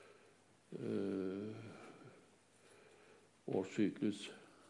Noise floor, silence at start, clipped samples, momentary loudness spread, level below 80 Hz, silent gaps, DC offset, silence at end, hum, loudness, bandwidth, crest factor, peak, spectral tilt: -69 dBFS; 0 s; under 0.1%; 26 LU; under -90 dBFS; none; under 0.1%; 0 s; none; -42 LUFS; 11.5 kHz; 20 dB; -24 dBFS; -6.5 dB/octave